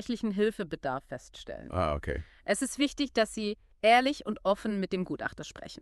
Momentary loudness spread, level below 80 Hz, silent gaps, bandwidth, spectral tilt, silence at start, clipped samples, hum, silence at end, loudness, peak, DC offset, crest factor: 17 LU; -50 dBFS; none; 13.5 kHz; -4.5 dB/octave; 0 s; under 0.1%; none; 0.05 s; -30 LUFS; -10 dBFS; under 0.1%; 22 dB